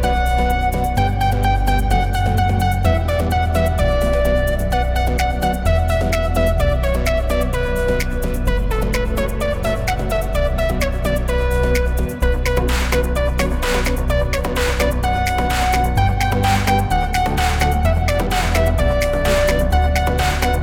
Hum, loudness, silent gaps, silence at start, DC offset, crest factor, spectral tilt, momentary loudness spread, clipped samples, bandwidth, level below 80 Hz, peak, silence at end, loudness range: none; -18 LUFS; none; 0 s; under 0.1%; 14 dB; -5.5 dB/octave; 3 LU; under 0.1%; 19 kHz; -20 dBFS; -2 dBFS; 0 s; 3 LU